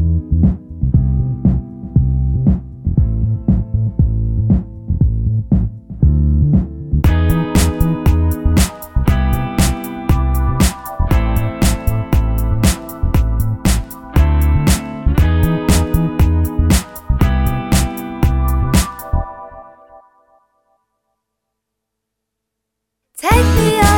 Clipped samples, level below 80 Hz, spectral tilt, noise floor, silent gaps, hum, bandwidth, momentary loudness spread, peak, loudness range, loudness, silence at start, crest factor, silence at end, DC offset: under 0.1%; -18 dBFS; -6 dB/octave; -77 dBFS; none; none; 19.5 kHz; 6 LU; 0 dBFS; 4 LU; -16 LUFS; 0 s; 14 dB; 0 s; under 0.1%